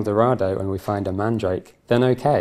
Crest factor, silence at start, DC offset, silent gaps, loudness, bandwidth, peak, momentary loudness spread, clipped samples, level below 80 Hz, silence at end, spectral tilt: 18 dB; 0 s; under 0.1%; none; -22 LUFS; 14.5 kHz; -2 dBFS; 7 LU; under 0.1%; -52 dBFS; 0 s; -8 dB/octave